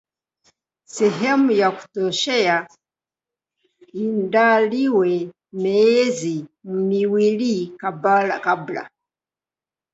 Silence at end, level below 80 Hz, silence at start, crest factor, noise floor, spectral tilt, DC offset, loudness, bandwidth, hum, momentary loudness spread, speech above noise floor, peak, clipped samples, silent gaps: 1.05 s; -70 dBFS; 0.95 s; 18 dB; under -90 dBFS; -5 dB/octave; under 0.1%; -19 LUFS; 8 kHz; none; 13 LU; over 71 dB; -4 dBFS; under 0.1%; none